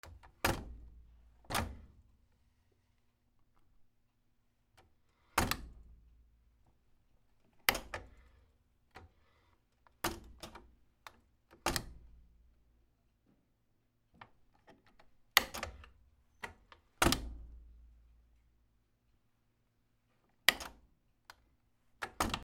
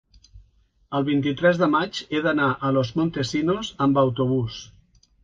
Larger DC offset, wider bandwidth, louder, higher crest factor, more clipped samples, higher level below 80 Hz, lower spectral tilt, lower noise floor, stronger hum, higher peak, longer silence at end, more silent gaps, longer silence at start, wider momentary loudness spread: neither; first, 16 kHz vs 7.8 kHz; second, -36 LUFS vs -23 LUFS; first, 40 dB vs 18 dB; neither; about the same, -54 dBFS vs -54 dBFS; second, -2.5 dB/octave vs -6.5 dB/octave; first, -76 dBFS vs -60 dBFS; neither; first, -2 dBFS vs -6 dBFS; second, 0 s vs 0.55 s; neither; second, 0.05 s vs 0.35 s; first, 26 LU vs 6 LU